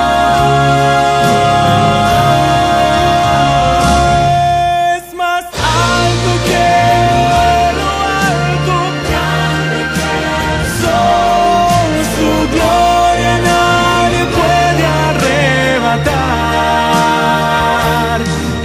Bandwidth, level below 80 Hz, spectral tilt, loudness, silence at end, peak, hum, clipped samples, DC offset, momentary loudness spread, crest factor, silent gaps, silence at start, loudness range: 16 kHz; -26 dBFS; -5 dB/octave; -11 LUFS; 0 s; 0 dBFS; none; under 0.1%; under 0.1%; 5 LU; 10 dB; none; 0 s; 3 LU